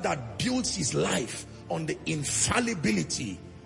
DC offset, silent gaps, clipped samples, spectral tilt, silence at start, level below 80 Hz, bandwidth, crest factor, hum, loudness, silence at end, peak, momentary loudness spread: under 0.1%; none; under 0.1%; -3.5 dB/octave; 0 s; -54 dBFS; 11.5 kHz; 18 dB; none; -28 LUFS; 0 s; -12 dBFS; 10 LU